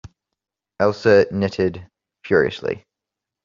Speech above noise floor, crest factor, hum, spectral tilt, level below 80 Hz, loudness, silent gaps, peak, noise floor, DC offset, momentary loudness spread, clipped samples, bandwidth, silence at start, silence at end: 67 dB; 18 dB; none; -5 dB/octave; -56 dBFS; -19 LUFS; none; -2 dBFS; -85 dBFS; under 0.1%; 13 LU; under 0.1%; 7.4 kHz; 0.05 s; 0.65 s